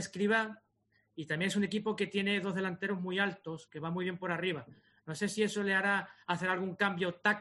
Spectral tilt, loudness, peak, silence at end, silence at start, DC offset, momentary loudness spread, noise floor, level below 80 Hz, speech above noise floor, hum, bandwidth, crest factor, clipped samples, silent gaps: -5 dB/octave; -33 LUFS; -14 dBFS; 0 s; 0 s; under 0.1%; 12 LU; -75 dBFS; -78 dBFS; 41 dB; none; 11.5 kHz; 20 dB; under 0.1%; none